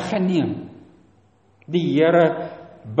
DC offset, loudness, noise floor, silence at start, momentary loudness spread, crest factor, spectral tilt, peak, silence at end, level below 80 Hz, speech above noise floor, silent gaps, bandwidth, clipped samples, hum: under 0.1%; -20 LUFS; -57 dBFS; 0 s; 19 LU; 18 dB; -7.5 dB/octave; -4 dBFS; 0 s; -62 dBFS; 38 dB; none; 8.4 kHz; under 0.1%; none